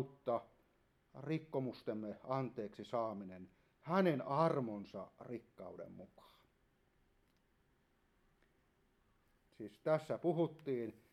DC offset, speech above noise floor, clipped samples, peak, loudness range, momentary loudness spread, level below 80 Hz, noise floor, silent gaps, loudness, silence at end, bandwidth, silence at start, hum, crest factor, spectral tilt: under 0.1%; 36 dB; under 0.1%; -20 dBFS; 17 LU; 19 LU; -80 dBFS; -76 dBFS; none; -40 LUFS; 0.2 s; 13.5 kHz; 0 s; none; 22 dB; -8.5 dB/octave